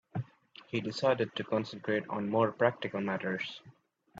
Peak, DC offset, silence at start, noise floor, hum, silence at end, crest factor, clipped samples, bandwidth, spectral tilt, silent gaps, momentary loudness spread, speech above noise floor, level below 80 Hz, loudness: -12 dBFS; under 0.1%; 0.15 s; -58 dBFS; none; 0 s; 22 dB; under 0.1%; 8 kHz; -6.5 dB/octave; none; 11 LU; 25 dB; -74 dBFS; -33 LUFS